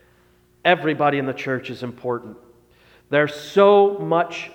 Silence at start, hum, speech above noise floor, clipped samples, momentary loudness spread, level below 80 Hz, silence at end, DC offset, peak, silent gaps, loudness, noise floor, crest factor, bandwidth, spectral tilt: 0.65 s; 60 Hz at -50 dBFS; 38 dB; under 0.1%; 14 LU; -64 dBFS; 0.05 s; under 0.1%; -2 dBFS; none; -20 LUFS; -57 dBFS; 18 dB; 13.5 kHz; -6 dB/octave